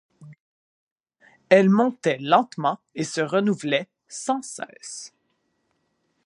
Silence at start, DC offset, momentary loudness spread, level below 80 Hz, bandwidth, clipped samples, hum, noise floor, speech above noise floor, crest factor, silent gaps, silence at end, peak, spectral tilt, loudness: 0.2 s; under 0.1%; 18 LU; -76 dBFS; 11 kHz; under 0.1%; none; -72 dBFS; 50 dB; 24 dB; 0.40-1.04 s; 1.2 s; -2 dBFS; -5 dB/octave; -22 LUFS